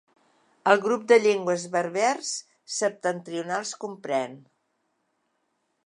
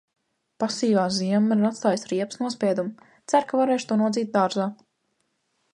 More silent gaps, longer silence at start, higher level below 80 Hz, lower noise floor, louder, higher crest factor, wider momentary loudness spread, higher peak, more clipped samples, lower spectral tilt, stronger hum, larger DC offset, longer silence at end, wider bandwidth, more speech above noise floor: neither; about the same, 0.65 s vs 0.6 s; second, -82 dBFS vs -72 dBFS; about the same, -75 dBFS vs -73 dBFS; about the same, -25 LUFS vs -24 LUFS; about the same, 22 dB vs 18 dB; first, 14 LU vs 7 LU; about the same, -4 dBFS vs -6 dBFS; neither; second, -3.5 dB/octave vs -5.5 dB/octave; neither; neither; first, 1.45 s vs 1 s; about the same, 11 kHz vs 11 kHz; about the same, 50 dB vs 50 dB